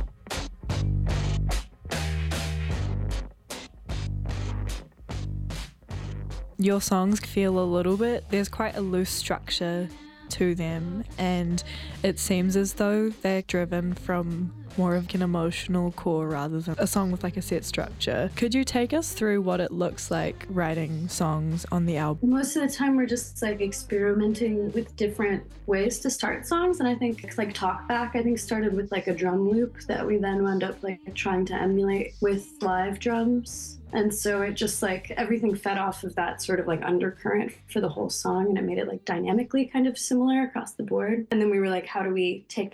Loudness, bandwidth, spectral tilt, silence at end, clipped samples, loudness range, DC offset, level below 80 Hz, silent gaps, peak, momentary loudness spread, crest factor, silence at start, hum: -27 LUFS; 16 kHz; -5.5 dB/octave; 0.05 s; under 0.1%; 4 LU; under 0.1%; -40 dBFS; none; -8 dBFS; 9 LU; 18 dB; 0 s; none